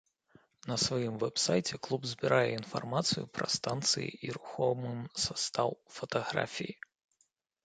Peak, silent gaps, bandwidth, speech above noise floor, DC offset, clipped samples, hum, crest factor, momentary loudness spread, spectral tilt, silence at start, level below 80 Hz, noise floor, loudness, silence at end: -12 dBFS; none; 9.4 kHz; 43 dB; under 0.1%; under 0.1%; none; 24 dB; 11 LU; -3.5 dB/octave; 0.65 s; -66 dBFS; -76 dBFS; -33 LUFS; 0.9 s